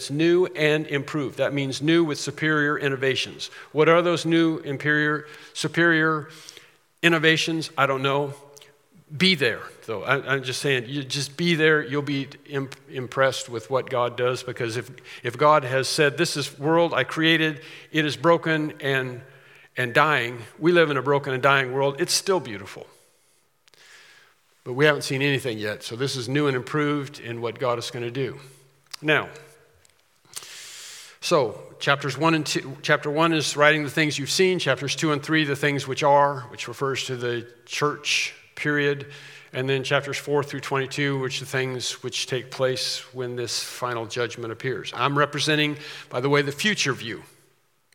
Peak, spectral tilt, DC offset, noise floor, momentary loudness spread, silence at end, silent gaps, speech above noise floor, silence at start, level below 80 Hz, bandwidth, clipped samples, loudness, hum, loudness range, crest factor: 0 dBFS; -4.5 dB/octave; under 0.1%; -65 dBFS; 13 LU; 0.7 s; none; 41 dB; 0 s; -74 dBFS; 17 kHz; under 0.1%; -23 LUFS; none; 5 LU; 24 dB